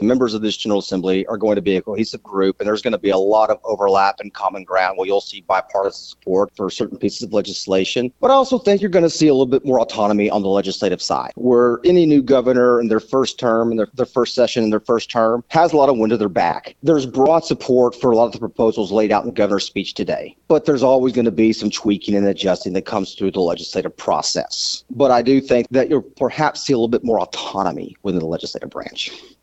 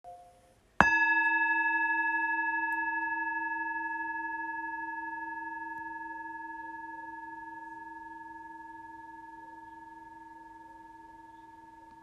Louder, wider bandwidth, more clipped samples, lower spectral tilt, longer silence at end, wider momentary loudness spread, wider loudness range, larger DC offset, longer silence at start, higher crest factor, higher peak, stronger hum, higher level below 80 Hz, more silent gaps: first, -18 LUFS vs -31 LUFS; second, 8.2 kHz vs 12 kHz; neither; about the same, -5 dB/octave vs -4.5 dB/octave; first, 0.2 s vs 0 s; second, 9 LU vs 25 LU; second, 4 LU vs 20 LU; neither; about the same, 0 s vs 0.05 s; second, 16 dB vs 32 dB; about the same, -2 dBFS vs -2 dBFS; neither; first, -52 dBFS vs -64 dBFS; neither